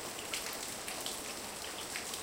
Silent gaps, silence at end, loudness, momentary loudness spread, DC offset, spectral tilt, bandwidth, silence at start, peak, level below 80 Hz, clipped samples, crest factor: none; 0 s; -39 LUFS; 3 LU; under 0.1%; -0.5 dB/octave; 17 kHz; 0 s; -22 dBFS; -66 dBFS; under 0.1%; 20 dB